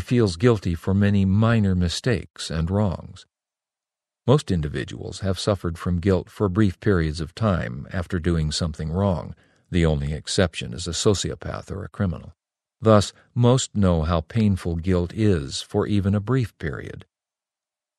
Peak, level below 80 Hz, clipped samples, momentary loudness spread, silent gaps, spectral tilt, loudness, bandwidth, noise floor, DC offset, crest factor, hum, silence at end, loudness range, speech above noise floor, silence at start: 0 dBFS; -40 dBFS; under 0.1%; 11 LU; 2.30-2.34 s; -6 dB/octave; -23 LUFS; 12 kHz; -90 dBFS; under 0.1%; 22 dB; none; 0.95 s; 4 LU; 68 dB; 0 s